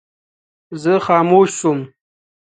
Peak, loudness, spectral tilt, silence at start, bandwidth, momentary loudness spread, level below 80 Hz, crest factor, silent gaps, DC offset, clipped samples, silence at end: 0 dBFS; -15 LUFS; -5.5 dB/octave; 0.7 s; 9.4 kHz; 18 LU; -62 dBFS; 18 dB; none; under 0.1%; under 0.1%; 0.7 s